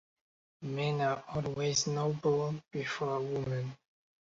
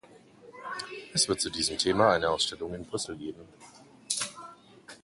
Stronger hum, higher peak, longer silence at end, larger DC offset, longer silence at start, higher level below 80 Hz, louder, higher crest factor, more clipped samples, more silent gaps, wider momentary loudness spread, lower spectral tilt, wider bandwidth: neither; second, -18 dBFS vs -8 dBFS; first, 0.5 s vs 0.05 s; neither; first, 0.6 s vs 0.45 s; second, -66 dBFS vs -58 dBFS; second, -34 LUFS vs -29 LUFS; second, 18 dB vs 24 dB; neither; neither; second, 8 LU vs 21 LU; first, -5 dB/octave vs -2.5 dB/octave; second, 7.6 kHz vs 11.5 kHz